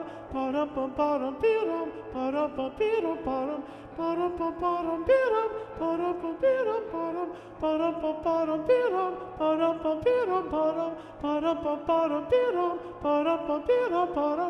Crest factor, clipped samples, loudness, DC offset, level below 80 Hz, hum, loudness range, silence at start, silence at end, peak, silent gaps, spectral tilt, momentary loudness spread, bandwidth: 16 dB; under 0.1%; -28 LUFS; under 0.1%; -56 dBFS; none; 2 LU; 0 s; 0 s; -12 dBFS; none; -7 dB/octave; 8 LU; 9 kHz